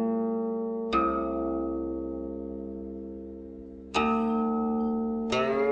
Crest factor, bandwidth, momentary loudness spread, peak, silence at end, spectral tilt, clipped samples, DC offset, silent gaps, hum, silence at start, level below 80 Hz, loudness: 16 dB; 8.6 kHz; 14 LU; -12 dBFS; 0 s; -6 dB/octave; under 0.1%; under 0.1%; none; none; 0 s; -50 dBFS; -29 LUFS